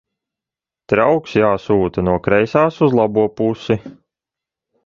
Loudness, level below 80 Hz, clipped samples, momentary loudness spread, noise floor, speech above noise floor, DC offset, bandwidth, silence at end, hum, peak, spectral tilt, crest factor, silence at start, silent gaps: -16 LUFS; -44 dBFS; under 0.1%; 6 LU; -88 dBFS; 72 dB; under 0.1%; 7.2 kHz; 0.95 s; none; 0 dBFS; -8 dB/octave; 16 dB; 0.9 s; none